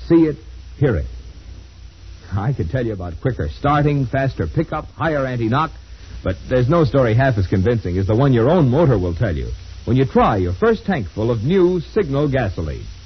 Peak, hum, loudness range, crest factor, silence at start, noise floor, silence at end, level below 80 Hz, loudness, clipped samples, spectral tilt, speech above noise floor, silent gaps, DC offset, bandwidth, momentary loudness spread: -4 dBFS; none; 6 LU; 14 dB; 0 s; -39 dBFS; 0 s; -34 dBFS; -18 LUFS; under 0.1%; -8.5 dB/octave; 21 dB; none; 0.2%; 6.4 kHz; 12 LU